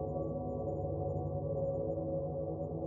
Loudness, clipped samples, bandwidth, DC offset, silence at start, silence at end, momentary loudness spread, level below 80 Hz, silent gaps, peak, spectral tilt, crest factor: -38 LUFS; under 0.1%; 1.4 kHz; under 0.1%; 0 s; 0 s; 2 LU; -52 dBFS; none; -24 dBFS; -16 dB/octave; 12 dB